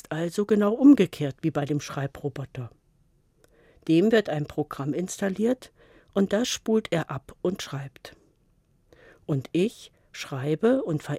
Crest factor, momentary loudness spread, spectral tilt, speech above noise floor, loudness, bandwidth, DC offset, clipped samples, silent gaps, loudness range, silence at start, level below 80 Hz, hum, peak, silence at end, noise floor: 20 dB; 16 LU; -6 dB/octave; 40 dB; -25 LUFS; 15.5 kHz; under 0.1%; under 0.1%; none; 7 LU; 0.1 s; -62 dBFS; none; -6 dBFS; 0 s; -65 dBFS